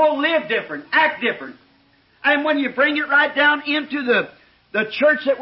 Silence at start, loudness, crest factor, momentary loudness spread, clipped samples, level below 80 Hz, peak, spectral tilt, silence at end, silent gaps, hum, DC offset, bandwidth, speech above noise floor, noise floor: 0 s; -18 LUFS; 14 dB; 8 LU; under 0.1%; -68 dBFS; -6 dBFS; -8.5 dB/octave; 0 s; none; none; under 0.1%; 5.8 kHz; 38 dB; -57 dBFS